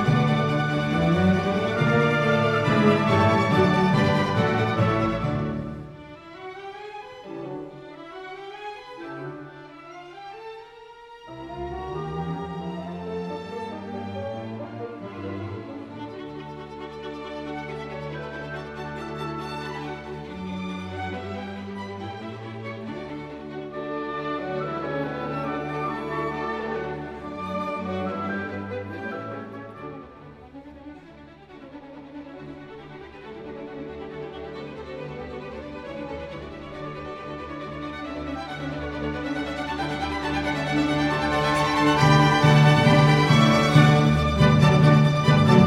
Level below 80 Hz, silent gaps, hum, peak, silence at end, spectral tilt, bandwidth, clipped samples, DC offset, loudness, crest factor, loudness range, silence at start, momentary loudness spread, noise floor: -46 dBFS; none; none; -2 dBFS; 0 s; -6.5 dB/octave; 11 kHz; under 0.1%; under 0.1%; -24 LUFS; 22 dB; 19 LU; 0 s; 23 LU; -46 dBFS